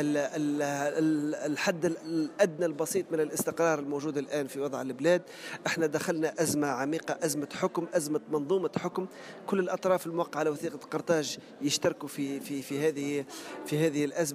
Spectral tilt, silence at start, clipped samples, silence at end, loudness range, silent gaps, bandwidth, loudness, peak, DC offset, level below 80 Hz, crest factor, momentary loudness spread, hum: -4.5 dB/octave; 0 s; under 0.1%; 0 s; 2 LU; none; 15.5 kHz; -31 LUFS; -12 dBFS; under 0.1%; -76 dBFS; 18 dB; 7 LU; none